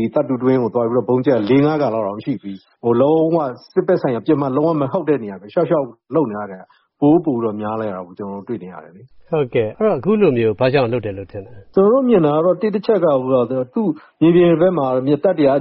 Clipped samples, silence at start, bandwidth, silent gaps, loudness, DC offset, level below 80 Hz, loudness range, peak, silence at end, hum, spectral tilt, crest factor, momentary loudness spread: under 0.1%; 0 s; 5.8 kHz; none; -17 LUFS; under 0.1%; -56 dBFS; 5 LU; -2 dBFS; 0 s; none; -7 dB/octave; 14 dB; 13 LU